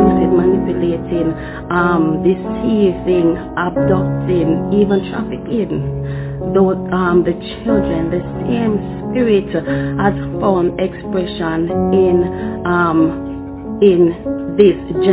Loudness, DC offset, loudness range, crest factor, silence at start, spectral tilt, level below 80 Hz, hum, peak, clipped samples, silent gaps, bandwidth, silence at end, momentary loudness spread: -16 LUFS; under 0.1%; 2 LU; 14 dB; 0 s; -12 dB/octave; -34 dBFS; none; 0 dBFS; under 0.1%; none; 4 kHz; 0 s; 8 LU